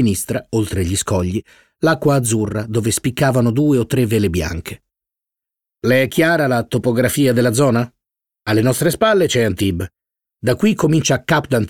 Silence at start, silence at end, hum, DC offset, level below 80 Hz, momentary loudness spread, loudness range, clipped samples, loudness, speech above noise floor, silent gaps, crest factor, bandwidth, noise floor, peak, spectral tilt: 0 s; 0 s; none; 0.2%; -42 dBFS; 9 LU; 2 LU; under 0.1%; -17 LUFS; 70 dB; none; 16 dB; 18.5 kHz; -86 dBFS; -2 dBFS; -5.5 dB/octave